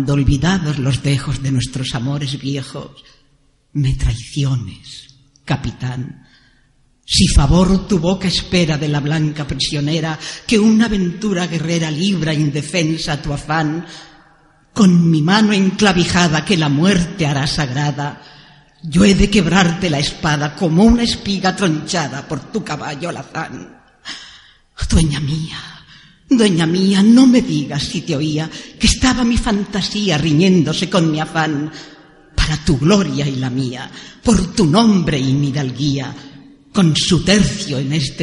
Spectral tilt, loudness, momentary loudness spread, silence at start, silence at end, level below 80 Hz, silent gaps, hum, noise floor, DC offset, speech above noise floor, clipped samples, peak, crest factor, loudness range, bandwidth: -5 dB/octave; -16 LUFS; 14 LU; 0 s; 0 s; -30 dBFS; none; none; -56 dBFS; under 0.1%; 40 dB; under 0.1%; 0 dBFS; 16 dB; 8 LU; 11.5 kHz